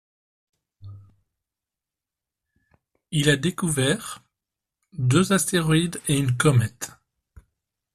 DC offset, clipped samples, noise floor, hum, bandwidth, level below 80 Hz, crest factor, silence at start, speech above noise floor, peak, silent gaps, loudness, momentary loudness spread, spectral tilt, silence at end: under 0.1%; under 0.1%; -88 dBFS; none; 14.5 kHz; -54 dBFS; 20 dB; 0.85 s; 67 dB; -6 dBFS; none; -22 LUFS; 17 LU; -5 dB/octave; 1.05 s